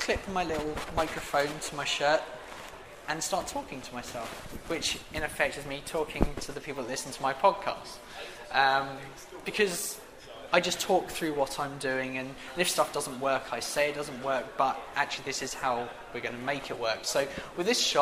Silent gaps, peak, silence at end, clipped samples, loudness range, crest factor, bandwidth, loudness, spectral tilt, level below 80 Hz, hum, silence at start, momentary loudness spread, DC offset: none; -6 dBFS; 0 s; under 0.1%; 4 LU; 26 dB; 15.5 kHz; -31 LUFS; -2.5 dB/octave; -48 dBFS; none; 0 s; 14 LU; under 0.1%